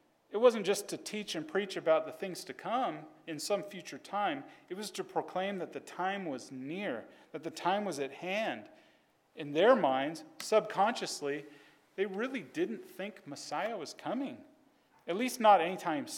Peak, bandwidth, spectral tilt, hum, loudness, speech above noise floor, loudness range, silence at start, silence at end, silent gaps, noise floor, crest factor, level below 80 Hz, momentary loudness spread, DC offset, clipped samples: -12 dBFS; 17.5 kHz; -4 dB/octave; none; -34 LUFS; 35 dB; 7 LU; 0.3 s; 0 s; none; -68 dBFS; 22 dB; -90 dBFS; 16 LU; under 0.1%; under 0.1%